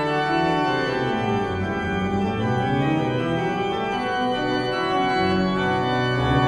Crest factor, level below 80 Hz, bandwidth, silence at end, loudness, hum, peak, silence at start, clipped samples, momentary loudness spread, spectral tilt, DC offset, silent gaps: 14 dB; -44 dBFS; 11.5 kHz; 0 s; -22 LUFS; none; -8 dBFS; 0 s; under 0.1%; 3 LU; -6.5 dB/octave; under 0.1%; none